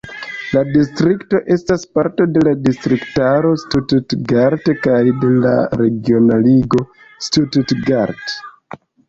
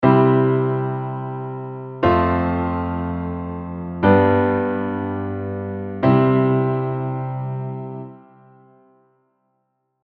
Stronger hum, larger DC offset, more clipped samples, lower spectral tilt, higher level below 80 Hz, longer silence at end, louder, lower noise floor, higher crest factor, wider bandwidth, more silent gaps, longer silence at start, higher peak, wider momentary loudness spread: neither; neither; neither; second, -7 dB/octave vs -11 dB/octave; about the same, -44 dBFS vs -44 dBFS; second, 0.6 s vs 1.85 s; first, -15 LUFS vs -20 LUFS; second, -37 dBFS vs -71 dBFS; second, 12 dB vs 18 dB; first, 7.8 kHz vs 4.7 kHz; neither; about the same, 0.05 s vs 0 s; about the same, -2 dBFS vs -2 dBFS; second, 7 LU vs 14 LU